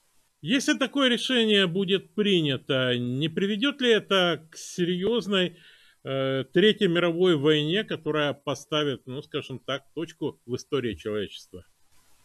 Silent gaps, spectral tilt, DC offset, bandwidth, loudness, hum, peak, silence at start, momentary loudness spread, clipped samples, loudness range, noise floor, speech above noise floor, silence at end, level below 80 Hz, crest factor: none; -5 dB/octave; under 0.1%; 13.5 kHz; -25 LUFS; none; -8 dBFS; 0.45 s; 12 LU; under 0.1%; 7 LU; -58 dBFS; 33 dB; 0.65 s; -64 dBFS; 18 dB